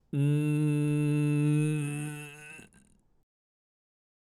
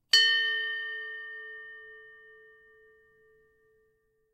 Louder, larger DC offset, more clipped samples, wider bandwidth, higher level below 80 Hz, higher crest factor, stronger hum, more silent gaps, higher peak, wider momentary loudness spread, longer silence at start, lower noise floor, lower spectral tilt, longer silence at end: second, -29 LUFS vs -26 LUFS; neither; neither; second, 12.5 kHz vs 16 kHz; first, -68 dBFS vs -80 dBFS; second, 14 dB vs 26 dB; neither; neither; second, -18 dBFS vs -8 dBFS; second, 18 LU vs 27 LU; about the same, 0.15 s vs 0.15 s; second, -63 dBFS vs -72 dBFS; first, -7.5 dB/octave vs 4 dB/octave; second, 1.6 s vs 2.2 s